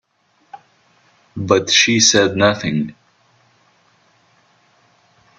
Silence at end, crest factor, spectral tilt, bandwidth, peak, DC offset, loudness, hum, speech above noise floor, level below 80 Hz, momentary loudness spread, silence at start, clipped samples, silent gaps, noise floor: 2.45 s; 20 dB; -2.5 dB/octave; 9.4 kHz; 0 dBFS; under 0.1%; -14 LUFS; none; 46 dB; -58 dBFS; 18 LU; 0.55 s; under 0.1%; none; -61 dBFS